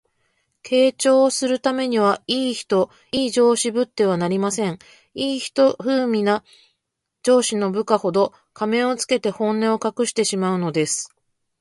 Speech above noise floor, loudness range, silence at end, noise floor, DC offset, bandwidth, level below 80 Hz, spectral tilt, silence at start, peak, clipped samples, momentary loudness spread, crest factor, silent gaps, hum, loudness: 59 dB; 2 LU; 0.55 s; -79 dBFS; under 0.1%; 11.5 kHz; -64 dBFS; -4 dB/octave; 0.65 s; -2 dBFS; under 0.1%; 8 LU; 18 dB; none; none; -20 LUFS